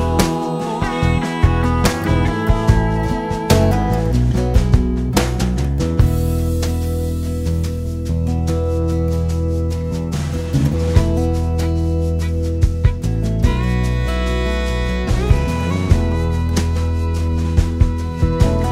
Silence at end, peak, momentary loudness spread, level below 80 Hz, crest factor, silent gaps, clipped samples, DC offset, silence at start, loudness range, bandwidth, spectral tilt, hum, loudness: 0 s; 0 dBFS; 5 LU; -20 dBFS; 16 dB; none; under 0.1%; under 0.1%; 0 s; 3 LU; 16 kHz; -6.5 dB/octave; none; -18 LUFS